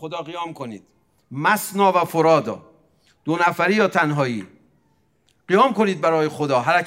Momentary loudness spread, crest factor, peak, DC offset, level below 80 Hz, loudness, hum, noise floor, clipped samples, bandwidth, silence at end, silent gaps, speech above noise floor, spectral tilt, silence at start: 16 LU; 18 dB; -4 dBFS; under 0.1%; -72 dBFS; -19 LUFS; none; -64 dBFS; under 0.1%; 16 kHz; 0 s; none; 44 dB; -5.5 dB/octave; 0 s